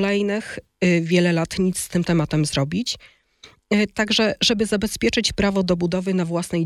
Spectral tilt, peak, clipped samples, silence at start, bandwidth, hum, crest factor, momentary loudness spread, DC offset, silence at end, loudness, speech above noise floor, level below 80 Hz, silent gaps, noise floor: -5 dB/octave; -4 dBFS; under 0.1%; 0 s; 14 kHz; none; 16 dB; 6 LU; under 0.1%; 0 s; -21 LUFS; 30 dB; -46 dBFS; none; -51 dBFS